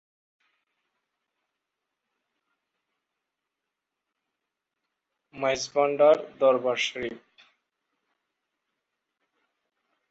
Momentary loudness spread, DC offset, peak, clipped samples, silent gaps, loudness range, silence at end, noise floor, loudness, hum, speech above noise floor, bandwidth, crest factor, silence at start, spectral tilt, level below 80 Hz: 10 LU; under 0.1%; -8 dBFS; under 0.1%; none; 11 LU; 2.95 s; -86 dBFS; -24 LUFS; none; 62 dB; 8 kHz; 22 dB; 5.35 s; -3 dB/octave; -74 dBFS